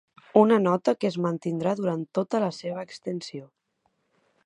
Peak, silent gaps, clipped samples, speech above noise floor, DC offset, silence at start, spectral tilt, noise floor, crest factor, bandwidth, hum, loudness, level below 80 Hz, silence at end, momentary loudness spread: -4 dBFS; none; under 0.1%; 48 dB; under 0.1%; 0.35 s; -7 dB/octave; -73 dBFS; 22 dB; 10.5 kHz; none; -25 LUFS; -74 dBFS; 1 s; 14 LU